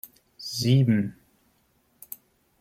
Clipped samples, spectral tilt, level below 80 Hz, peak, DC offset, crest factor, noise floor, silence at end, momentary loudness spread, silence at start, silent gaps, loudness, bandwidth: under 0.1%; -6 dB/octave; -64 dBFS; -10 dBFS; under 0.1%; 18 dB; -67 dBFS; 1.5 s; 22 LU; 0.4 s; none; -24 LUFS; 16 kHz